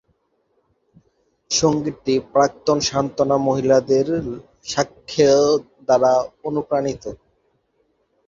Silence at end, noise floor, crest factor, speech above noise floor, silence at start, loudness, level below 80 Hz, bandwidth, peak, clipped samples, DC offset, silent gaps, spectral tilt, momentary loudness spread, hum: 1.1 s; -67 dBFS; 18 dB; 48 dB; 1.5 s; -19 LUFS; -52 dBFS; 7.8 kHz; -2 dBFS; under 0.1%; under 0.1%; none; -4.5 dB/octave; 10 LU; none